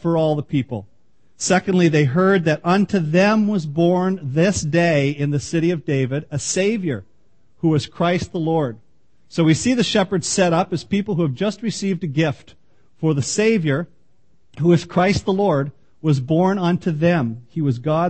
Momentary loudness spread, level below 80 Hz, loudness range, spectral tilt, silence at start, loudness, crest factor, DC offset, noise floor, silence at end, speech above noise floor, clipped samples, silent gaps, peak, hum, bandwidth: 8 LU; -50 dBFS; 4 LU; -6 dB/octave; 0.05 s; -19 LUFS; 16 dB; 0.4%; -63 dBFS; 0 s; 45 dB; under 0.1%; none; -4 dBFS; none; 8.8 kHz